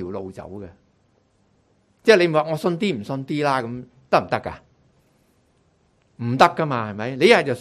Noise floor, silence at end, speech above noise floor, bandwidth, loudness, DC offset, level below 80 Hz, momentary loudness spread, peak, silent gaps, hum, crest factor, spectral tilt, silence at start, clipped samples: -62 dBFS; 0 s; 42 dB; 14 kHz; -20 LUFS; under 0.1%; -56 dBFS; 21 LU; 0 dBFS; none; none; 22 dB; -5.5 dB/octave; 0 s; under 0.1%